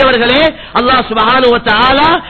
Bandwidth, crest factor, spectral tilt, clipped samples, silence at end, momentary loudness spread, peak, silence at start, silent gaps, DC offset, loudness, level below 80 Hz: 8 kHz; 10 dB; -6 dB/octave; 0.3%; 0 s; 3 LU; 0 dBFS; 0 s; none; under 0.1%; -9 LUFS; -32 dBFS